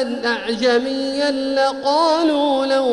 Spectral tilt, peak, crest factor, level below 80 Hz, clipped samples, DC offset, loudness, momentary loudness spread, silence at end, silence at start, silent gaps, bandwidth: -3 dB/octave; -4 dBFS; 14 dB; -56 dBFS; under 0.1%; under 0.1%; -18 LUFS; 5 LU; 0 s; 0 s; none; 11 kHz